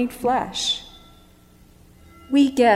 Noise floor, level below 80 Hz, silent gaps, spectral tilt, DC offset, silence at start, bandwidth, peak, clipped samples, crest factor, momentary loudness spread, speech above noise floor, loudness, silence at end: -51 dBFS; -52 dBFS; none; -3.5 dB/octave; under 0.1%; 0 s; 15 kHz; -6 dBFS; under 0.1%; 18 dB; 9 LU; 32 dB; -21 LUFS; 0 s